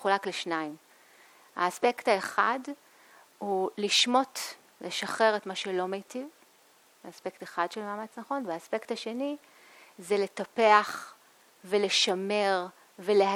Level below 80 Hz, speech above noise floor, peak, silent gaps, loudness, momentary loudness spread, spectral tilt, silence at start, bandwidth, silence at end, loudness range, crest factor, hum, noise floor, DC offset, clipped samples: -84 dBFS; 33 dB; -6 dBFS; none; -29 LUFS; 17 LU; -2.5 dB/octave; 0 s; 17.5 kHz; 0 s; 8 LU; 24 dB; none; -62 dBFS; under 0.1%; under 0.1%